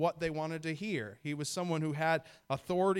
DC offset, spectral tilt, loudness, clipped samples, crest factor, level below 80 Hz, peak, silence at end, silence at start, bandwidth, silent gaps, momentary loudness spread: under 0.1%; -5.5 dB/octave; -35 LUFS; under 0.1%; 16 dB; -66 dBFS; -18 dBFS; 0 s; 0 s; 17 kHz; none; 7 LU